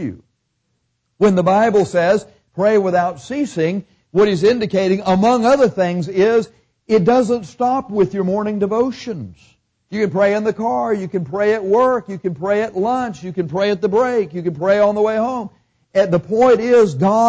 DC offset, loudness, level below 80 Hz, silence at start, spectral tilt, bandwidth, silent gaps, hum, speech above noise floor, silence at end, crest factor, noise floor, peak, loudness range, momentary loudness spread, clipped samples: under 0.1%; -17 LUFS; -54 dBFS; 0 s; -6.5 dB/octave; 8 kHz; none; none; 53 dB; 0 s; 12 dB; -69 dBFS; -4 dBFS; 3 LU; 10 LU; under 0.1%